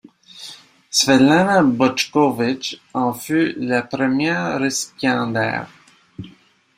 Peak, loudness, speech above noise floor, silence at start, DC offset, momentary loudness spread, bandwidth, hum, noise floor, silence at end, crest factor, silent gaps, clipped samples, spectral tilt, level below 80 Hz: -2 dBFS; -18 LUFS; 33 dB; 0.35 s; under 0.1%; 22 LU; 16 kHz; none; -51 dBFS; 0.5 s; 18 dB; none; under 0.1%; -4 dB/octave; -58 dBFS